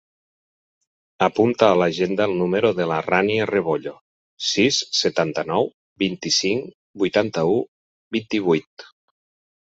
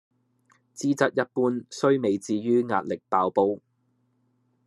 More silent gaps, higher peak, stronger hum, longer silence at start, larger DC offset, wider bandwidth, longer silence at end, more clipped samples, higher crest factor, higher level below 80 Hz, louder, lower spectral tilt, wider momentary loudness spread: first, 4.01-4.37 s, 5.74-5.96 s, 6.75-6.94 s, 7.68-8.11 s, 8.67-8.77 s vs none; first, -2 dBFS vs -6 dBFS; neither; first, 1.2 s vs 0.75 s; neither; second, 8 kHz vs 12.5 kHz; second, 0.75 s vs 1.1 s; neither; about the same, 20 dB vs 22 dB; first, -60 dBFS vs -78 dBFS; first, -21 LUFS vs -25 LUFS; second, -4 dB/octave vs -6 dB/octave; first, 9 LU vs 5 LU